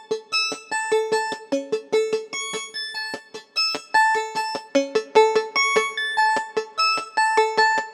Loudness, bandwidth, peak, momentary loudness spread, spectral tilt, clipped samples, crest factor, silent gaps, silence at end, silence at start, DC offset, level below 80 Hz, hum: -22 LUFS; 14 kHz; -2 dBFS; 9 LU; -1 dB/octave; under 0.1%; 20 dB; none; 0 s; 0 s; under 0.1%; -86 dBFS; none